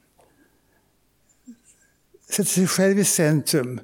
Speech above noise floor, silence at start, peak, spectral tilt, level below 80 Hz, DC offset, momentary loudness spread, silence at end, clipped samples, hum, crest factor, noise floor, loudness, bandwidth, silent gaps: 44 dB; 1.5 s; -8 dBFS; -4 dB/octave; -70 dBFS; under 0.1%; 5 LU; 0 s; under 0.1%; none; 16 dB; -64 dBFS; -20 LUFS; 19 kHz; none